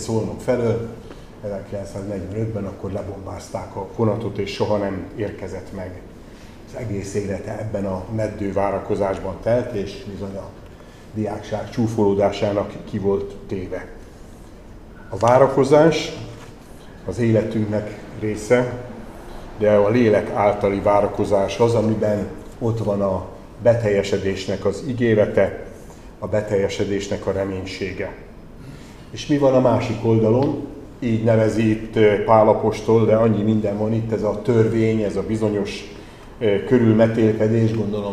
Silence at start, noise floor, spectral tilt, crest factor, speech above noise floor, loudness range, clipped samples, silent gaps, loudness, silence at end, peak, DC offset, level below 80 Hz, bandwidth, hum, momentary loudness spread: 0 s; -41 dBFS; -7 dB/octave; 20 dB; 21 dB; 8 LU; under 0.1%; none; -20 LUFS; 0 s; 0 dBFS; 0.2%; -44 dBFS; 12.5 kHz; none; 18 LU